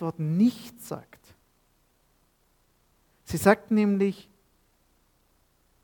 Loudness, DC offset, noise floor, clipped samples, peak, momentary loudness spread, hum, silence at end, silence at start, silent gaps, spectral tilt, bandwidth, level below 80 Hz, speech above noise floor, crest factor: -25 LUFS; under 0.1%; -67 dBFS; under 0.1%; -4 dBFS; 18 LU; none; 1.6 s; 0 s; none; -6.5 dB/octave; 19 kHz; -62 dBFS; 42 dB; 26 dB